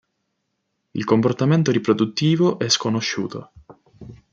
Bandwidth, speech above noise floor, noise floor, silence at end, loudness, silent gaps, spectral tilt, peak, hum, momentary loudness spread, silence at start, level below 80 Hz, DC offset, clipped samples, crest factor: 7.8 kHz; 55 dB; -74 dBFS; 0.15 s; -20 LUFS; none; -5.5 dB/octave; -2 dBFS; none; 12 LU; 0.95 s; -60 dBFS; under 0.1%; under 0.1%; 18 dB